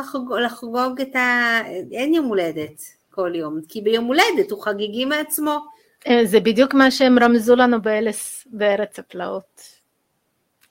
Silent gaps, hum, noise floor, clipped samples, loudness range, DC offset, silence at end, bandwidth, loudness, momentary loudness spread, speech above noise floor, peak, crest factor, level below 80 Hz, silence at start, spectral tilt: none; none; -70 dBFS; under 0.1%; 5 LU; under 0.1%; 1.3 s; 16.5 kHz; -19 LUFS; 14 LU; 51 dB; 0 dBFS; 20 dB; -62 dBFS; 0 s; -3.5 dB/octave